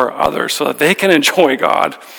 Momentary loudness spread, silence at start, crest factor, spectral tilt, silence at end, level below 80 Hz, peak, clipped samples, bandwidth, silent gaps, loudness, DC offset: 6 LU; 0 s; 14 dB; -3.5 dB/octave; 0 s; -50 dBFS; 0 dBFS; under 0.1%; over 20 kHz; none; -13 LUFS; under 0.1%